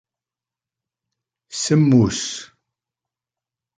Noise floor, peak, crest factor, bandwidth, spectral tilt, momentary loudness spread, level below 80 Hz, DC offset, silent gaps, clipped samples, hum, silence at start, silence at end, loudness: -89 dBFS; -4 dBFS; 20 dB; 9.6 kHz; -5.5 dB/octave; 17 LU; -52 dBFS; under 0.1%; none; under 0.1%; none; 1.5 s; 1.35 s; -18 LUFS